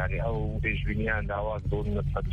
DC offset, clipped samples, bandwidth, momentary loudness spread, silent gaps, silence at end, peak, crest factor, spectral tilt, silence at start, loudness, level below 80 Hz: under 0.1%; under 0.1%; 4.6 kHz; 2 LU; none; 0 s; -14 dBFS; 14 dB; -9 dB/octave; 0 s; -30 LUFS; -34 dBFS